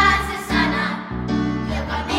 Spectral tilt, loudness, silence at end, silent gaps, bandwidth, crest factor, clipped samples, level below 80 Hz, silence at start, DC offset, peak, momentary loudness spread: -5 dB/octave; -21 LUFS; 0 s; none; 16.5 kHz; 16 dB; under 0.1%; -32 dBFS; 0 s; under 0.1%; -4 dBFS; 6 LU